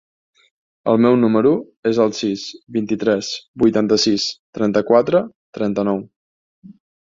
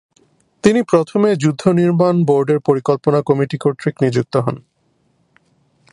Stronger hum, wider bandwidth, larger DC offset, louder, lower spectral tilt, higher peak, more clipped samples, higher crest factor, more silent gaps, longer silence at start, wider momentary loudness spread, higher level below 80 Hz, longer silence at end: neither; second, 7.6 kHz vs 11 kHz; neither; about the same, -18 LUFS vs -16 LUFS; second, -5.5 dB/octave vs -7.5 dB/octave; about the same, -2 dBFS vs 0 dBFS; neither; about the same, 16 dB vs 16 dB; first, 1.77-1.83 s, 3.48-3.54 s, 4.39-4.53 s, 5.35-5.53 s, 6.16-6.62 s vs none; first, 0.85 s vs 0.65 s; first, 11 LU vs 5 LU; about the same, -58 dBFS vs -56 dBFS; second, 0.5 s vs 1.3 s